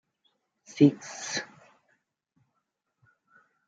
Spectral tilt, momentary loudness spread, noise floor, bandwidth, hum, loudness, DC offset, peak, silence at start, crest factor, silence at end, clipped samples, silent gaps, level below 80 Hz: -5.5 dB/octave; 23 LU; -80 dBFS; 8 kHz; none; -26 LUFS; under 0.1%; -6 dBFS; 0.75 s; 26 dB; 2.25 s; under 0.1%; none; -80 dBFS